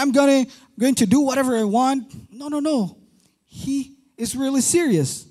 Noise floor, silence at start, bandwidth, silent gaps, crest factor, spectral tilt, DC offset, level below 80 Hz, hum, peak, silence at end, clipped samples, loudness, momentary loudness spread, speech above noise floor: -58 dBFS; 0 s; 14.5 kHz; none; 14 dB; -4.5 dB/octave; under 0.1%; -56 dBFS; none; -6 dBFS; 0.05 s; under 0.1%; -20 LUFS; 13 LU; 39 dB